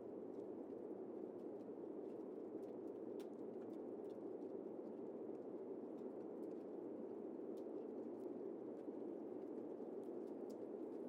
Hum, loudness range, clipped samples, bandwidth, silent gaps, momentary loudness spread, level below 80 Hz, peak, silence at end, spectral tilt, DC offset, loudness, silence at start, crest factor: none; 1 LU; under 0.1%; 11.5 kHz; none; 1 LU; under -90 dBFS; -38 dBFS; 0 s; -8.5 dB/octave; under 0.1%; -51 LUFS; 0 s; 14 dB